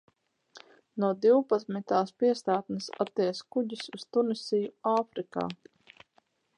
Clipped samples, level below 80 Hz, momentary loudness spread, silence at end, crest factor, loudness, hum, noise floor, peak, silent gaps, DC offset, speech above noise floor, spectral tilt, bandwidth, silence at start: under 0.1%; -78 dBFS; 11 LU; 1.05 s; 18 dB; -29 LUFS; none; -70 dBFS; -12 dBFS; none; under 0.1%; 41 dB; -6 dB/octave; 10.5 kHz; 0.55 s